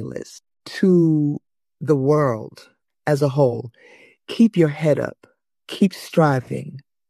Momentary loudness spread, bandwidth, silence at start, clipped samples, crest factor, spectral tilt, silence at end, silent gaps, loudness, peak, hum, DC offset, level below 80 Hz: 18 LU; 13 kHz; 0 s; under 0.1%; 18 dB; -7.5 dB/octave; 0.3 s; none; -19 LUFS; -4 dBFS; none; under 0.1%; -62 dBFS